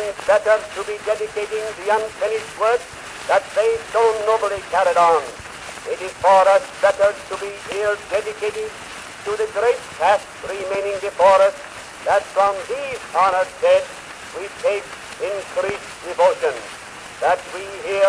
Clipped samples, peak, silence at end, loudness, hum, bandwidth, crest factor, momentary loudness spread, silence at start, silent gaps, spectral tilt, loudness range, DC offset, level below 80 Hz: under 0.1%; -2 dBFS; 0 s; -20 LUFS; none; 11 kHz; 16 dB; 15 LU; 0 s; none; -2.5 dB/octave; 5 LU; under 0.1%; -54 dBFS